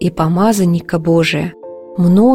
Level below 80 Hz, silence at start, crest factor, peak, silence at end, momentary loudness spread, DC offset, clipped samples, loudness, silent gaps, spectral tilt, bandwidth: -42 dBFS; 0 s; 12 dB; -2 dBFS; 0 s; 12 LU; under 0.1%; under 0.1%; -14 LUFS; none; -6.5 dB/octave; 16.5 kHz